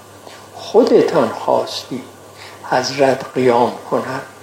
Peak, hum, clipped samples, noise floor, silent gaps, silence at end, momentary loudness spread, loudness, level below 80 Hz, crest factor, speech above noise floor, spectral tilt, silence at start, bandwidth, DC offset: 0 dBFS; none; under 0.1%; -38 dBFS; none; 0.1 s; 23 LU; -16 LUFS; -66 dBFS; 16 dB; 22 dB; -5 dB/octave; 0 s; 16.5 kHz; under 0.1%